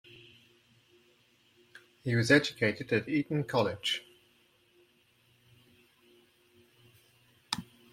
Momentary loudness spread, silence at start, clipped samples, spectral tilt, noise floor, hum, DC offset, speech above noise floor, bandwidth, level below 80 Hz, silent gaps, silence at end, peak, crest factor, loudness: 14 LU; 2.05 s; under 0.1%; -5 dB/octave; -68 dBFS; none; under 0.1%; 38 dB; 16 kHz; -70 dBFS; none; 0.3 s; -8 dBFS; 26 dB; -30 LUFS